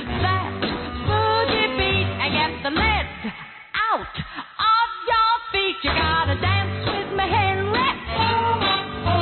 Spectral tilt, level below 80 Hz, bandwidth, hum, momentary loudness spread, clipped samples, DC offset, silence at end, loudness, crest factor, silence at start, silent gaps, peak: -10 dB/octave; -38 dBFS; 4.5 kHz; none; 7 LU; under 0.1%; under 0.1%; 0 s; -21 LUFS; 14 dB; 0 s; none; -8 dBFS